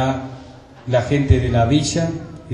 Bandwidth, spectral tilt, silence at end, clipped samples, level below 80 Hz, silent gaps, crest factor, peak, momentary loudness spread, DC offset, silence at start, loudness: 10.5 kHz; -6 dB/octave; 0 s; under 0.1%; -32 dBFS; none; 18 dB; 0 dBFS; 18 LU; under 0.1%; 0 s; -18 LUFS